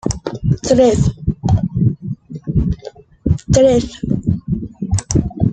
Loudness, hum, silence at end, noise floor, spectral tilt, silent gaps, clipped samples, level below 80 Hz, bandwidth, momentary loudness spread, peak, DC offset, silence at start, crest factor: -17 LUFS; none; 0 s; -36 dBFS; -7 dB/octave; none; under 0.1%; -30 dBFS; 9.4 kHz; 13 LU; -2 dBFS; under 0.1%; 0.05 s; 14 dB